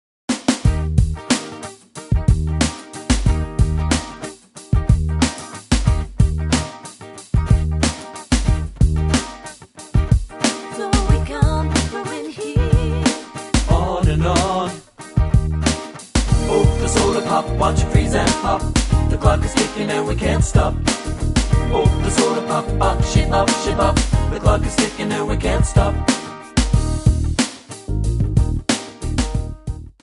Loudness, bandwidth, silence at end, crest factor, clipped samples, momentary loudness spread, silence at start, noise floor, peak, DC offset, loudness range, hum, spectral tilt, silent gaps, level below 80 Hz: -19 LUFS; 11.5 kHz; 0.15 s; 16 dB; under 0.1%; 10 LU; 0.3 s; -37 dBFS; -2 dBFS; under 0.1%; 3 LU; none; -5.5 dB/octave; none; -22 dBFS